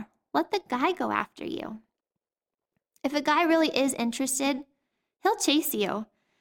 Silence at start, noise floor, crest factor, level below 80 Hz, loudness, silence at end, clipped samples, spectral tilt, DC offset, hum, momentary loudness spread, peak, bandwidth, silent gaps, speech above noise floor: 0 s; under -90 dBFS; 20 dB; -68 dBFS; -27 LUFS; 0.35 s; under 0.1%; -2.5 dB/octave; under 0.1%; none; 13 LU; -8 dBFS; 18 kHz; none; over 63 dB